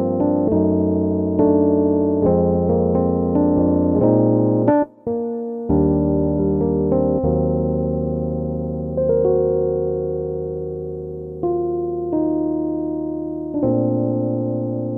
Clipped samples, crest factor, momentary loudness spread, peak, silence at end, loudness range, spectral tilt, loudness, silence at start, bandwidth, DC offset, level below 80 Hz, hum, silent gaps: under 0.1%; 16 dB; 9 LU; -4 dBFS; 0 s; 6 LU; -14 dB/octave; -19 LUFS; 0 s; 2.3 kHz; under 0.1%; -36 dBFS; none; none